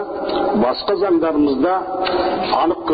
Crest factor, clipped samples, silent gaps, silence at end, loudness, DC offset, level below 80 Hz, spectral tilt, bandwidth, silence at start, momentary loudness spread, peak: 12 dB; under 0.1%; none; 0 s; -18 LUFS; under 0.1%; -46 dBFS; -3.5 dB/octave; 5 kHz; 0 s; 4 LU; -6 dBFS